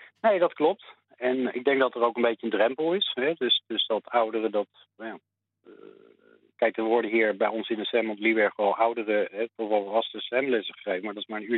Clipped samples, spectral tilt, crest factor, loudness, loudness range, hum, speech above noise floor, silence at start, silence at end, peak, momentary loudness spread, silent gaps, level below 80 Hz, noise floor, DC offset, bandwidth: under 0.1%; -7.5 dB/octave; 18 dB; -26 LUFS; 4 LU; none; 33 dB; 0 s; 0 s; -10 dBFS; 8 LU; none; -86 dBFS; -60 dBFS; under 0.1%; 4.2 kHz